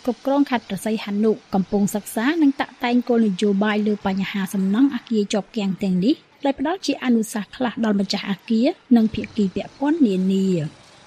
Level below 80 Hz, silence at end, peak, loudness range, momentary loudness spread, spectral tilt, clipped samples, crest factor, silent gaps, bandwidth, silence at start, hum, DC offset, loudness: -54 dBFS; 0.35 s; -6 dBFS; 2 LU; 6 LU; -6 dB/octave; under 0.1%; 16 dB; none; 15 kHz; 0.05 s; none; under 0.1%; -21 LUFS